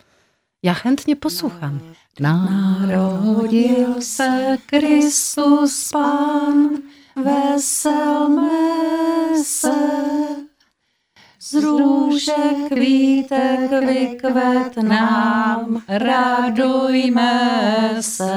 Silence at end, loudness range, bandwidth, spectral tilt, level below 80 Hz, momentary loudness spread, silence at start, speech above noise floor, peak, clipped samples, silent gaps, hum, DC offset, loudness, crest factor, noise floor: 0 s; 3 LU; 16 kHz; -4.5 dB/octave; -60 dBFS; 7 LU; 0.65 s; 51 dB; -2 dBFS; under 0.1%; none; none; under 0.1%; -17 LUFS; 14 dB; -67 dBFS